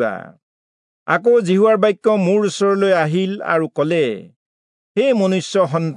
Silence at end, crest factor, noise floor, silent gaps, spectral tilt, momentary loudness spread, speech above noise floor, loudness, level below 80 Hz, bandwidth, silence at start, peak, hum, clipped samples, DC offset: 0 s; 14 dB; under -90 dBFS; 0.43-1.06 s, 4.36-4.95 s; -6 dB/octave; 8 LU; over 74 dB; -17 LUFS; -72 dBFS; 11 kHz; 0 s; -2 dBFS; none; under 0.1%; under 0.1%